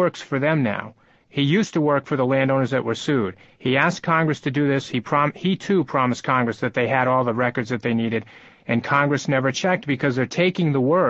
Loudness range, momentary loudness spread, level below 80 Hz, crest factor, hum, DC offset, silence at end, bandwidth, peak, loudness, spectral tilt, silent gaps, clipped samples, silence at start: 1 LU; 6 LU; -60 dBFS; 18 dB; none; under 0.1%; 0 s; 8 kHz; -2 dBFS; -21 LUFS; -6 dB/octave; none; under 0.1%; 0 s